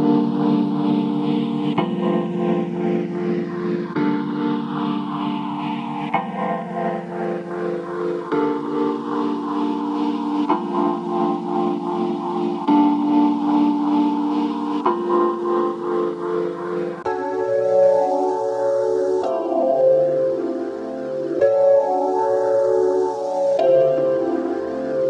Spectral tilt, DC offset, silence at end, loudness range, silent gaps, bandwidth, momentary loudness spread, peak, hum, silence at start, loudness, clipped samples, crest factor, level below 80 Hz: -8 dB/octave; under 0.1%; 0 s; 5 LU; none; 8.4 kHz; 9 LU; -6 dBFS; none; 0 s; -21 LUFS; under 0.1%; 14 dB; -70 dBFS